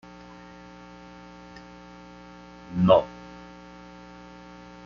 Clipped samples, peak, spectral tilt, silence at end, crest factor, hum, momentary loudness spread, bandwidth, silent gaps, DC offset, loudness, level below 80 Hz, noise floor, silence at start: under 0.1%; -4 dBFS; -6.5 dB/octave; 1.65 s; 26 dB; 60 Hz at -45 dBFS; 26 LU; 7 kHz; none; under 0.1%; -22 LUFS; -56 dBFS; -46 dBFS; 2.7 s